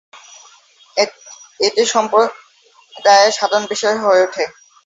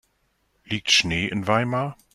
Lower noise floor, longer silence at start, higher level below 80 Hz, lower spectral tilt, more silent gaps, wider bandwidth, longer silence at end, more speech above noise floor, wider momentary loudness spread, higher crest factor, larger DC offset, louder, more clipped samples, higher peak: second, -49 dBFS vs -69 dBFS; second, 0.15 s vs 0.7 s; second, -68 dBFS vs -54 dBFS; second, -1 dB/octave vs -3.5 dB/octave; neither; second, 8 kHz vs 13.5 kHz; first, 0.35 s vs 0.2 s; second, 35 dB vs 46 dB; about the same, 10 LU vs 10 LU; second, 16 dB vs 22 dB; neither; first, -15 LUFS vs -22 LUFS; neither; first, 0 dBFS vs -4 dBFS